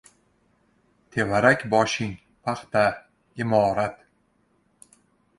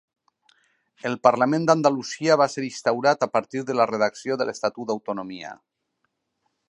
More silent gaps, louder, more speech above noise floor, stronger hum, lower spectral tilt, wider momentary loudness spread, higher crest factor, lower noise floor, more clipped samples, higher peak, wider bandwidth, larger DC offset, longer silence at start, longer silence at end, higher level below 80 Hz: neither; about the same, -23 LUFS vs -23 LUFS; second, 44 dB vs 53 dB; neither; about the same, -5 dB/octave vs -5 dB/octave; about the same, 14 LU vs 12 LU; about the same, 22 dB vs 22 dB; second, -66 dBFS vs -76 dBFS; neither; about the same, -4 dBFS vs -2 dBFS; about the same, 11.5 kHz vs 11 kHz; neither; about the same, 1.15 s vs 1.05 s; first, 1.45 s vs 1.15 s; first, -56 dBFS vs -74 dBFS